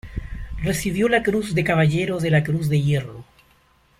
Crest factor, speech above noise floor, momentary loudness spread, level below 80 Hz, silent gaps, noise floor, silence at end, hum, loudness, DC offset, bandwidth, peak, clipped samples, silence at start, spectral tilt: 16 dB; 38 dB; 15 LU; -38 dBFS; none; -58 dBFS; 0.75 s; none; -21 LUFS; under 0.1%; 15.5 kHz; -6 dBFS; under 0.1%; 0.05 s; -6.5 dB/octave